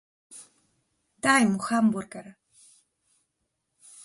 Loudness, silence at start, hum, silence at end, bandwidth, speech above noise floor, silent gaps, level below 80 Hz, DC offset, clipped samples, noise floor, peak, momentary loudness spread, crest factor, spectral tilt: -24 LUFS; 0.3 s; none; 1.75 s; 11.5 kHz; 55 dB; none; -70 dBFS; under 0.1%; under 0.1%; -79 dBFS; -8 dBFS; 26 LU; 22 dB; -4 dB/octave